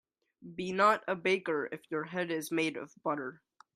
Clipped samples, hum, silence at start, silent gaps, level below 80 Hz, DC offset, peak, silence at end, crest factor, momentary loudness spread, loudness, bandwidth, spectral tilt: under 0.1%; none; 0.4 s; none; -78 dBFS; under 0.1%; -12 dBFS; 0.4 s; 22 dB; 12 LU; -32 LUFS; 15.5 kHz; -4.5 dB/octave